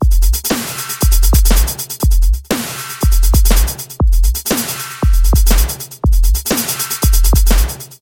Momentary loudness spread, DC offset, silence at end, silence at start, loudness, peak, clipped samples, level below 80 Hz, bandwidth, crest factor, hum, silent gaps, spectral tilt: 7 LU; under 0.1%; 0.1 s; 0 s; -15 LUFS; 0 dBFS; under 0.1%; -12 dBFS; 17 kHz; 12 dB; none; none; -4 dB/octave